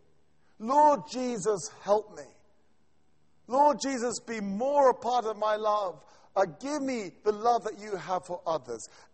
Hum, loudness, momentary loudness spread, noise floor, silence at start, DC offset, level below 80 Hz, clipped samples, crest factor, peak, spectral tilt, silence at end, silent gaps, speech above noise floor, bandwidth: none; -29 LUFS; 12 LU; -71 dBFS; 0.6 s; under 0.1%; -70 dBFS; under 0.1%; 18 dB; -10 dBFS; -4 dB/octave; 0.3 s; none; 43 dB; 8.4 kHz